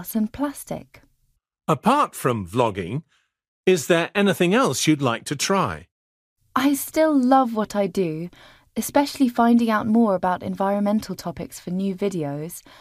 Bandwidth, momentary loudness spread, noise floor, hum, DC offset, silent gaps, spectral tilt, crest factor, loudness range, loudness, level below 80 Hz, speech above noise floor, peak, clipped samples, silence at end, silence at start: 15.5 kHz; 14 LU; -67 dBFS; none; under 0.1%; 3.48-3.63 s, 5.92-6.36 s; -5 dB/octave; 18 dB; 3 LU; -21 LUFS; -56 dBFS; 46 dB; -4 dBFS; under 0.1%; 0.2 s; 0 s